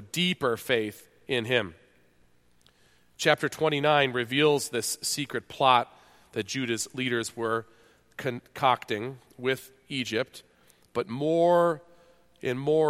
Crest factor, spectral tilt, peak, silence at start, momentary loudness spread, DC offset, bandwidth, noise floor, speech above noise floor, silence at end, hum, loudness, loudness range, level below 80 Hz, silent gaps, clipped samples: 24 dB; -4 dB/octave; -6 dBFS; 0 s; 13 LU; under 0.1%; 16 kHz; -62 dBFS; 35 dB; 0 s; none; -27 LUFS; 5 LU; -68 dBFS; none; under 0.1%